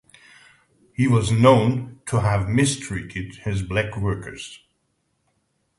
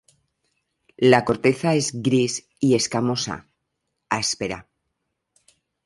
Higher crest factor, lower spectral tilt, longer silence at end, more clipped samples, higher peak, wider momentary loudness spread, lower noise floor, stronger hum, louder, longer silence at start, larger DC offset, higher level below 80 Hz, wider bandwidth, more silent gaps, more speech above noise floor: about the same, 22 dB vs 22 dB; first, -6 dB/octave vs -4.5 dB/octave; about the same, 1.2 s vs 1.25 s; neither; about the same, 0 dBFS vs -2 dBFS; first, 18 LU vs 12 LU; second, -71 dBFS vs -78 dBFS; neither; about the same, -21 LUFS vs -21 LUFS; about the same, 1 s vs 1 s; neither; first, -44 dBFS vs -58 dBFS; about the same, 11.5 kHz vs 11.5 kHz; neither; second, 50 dB vs 57 dB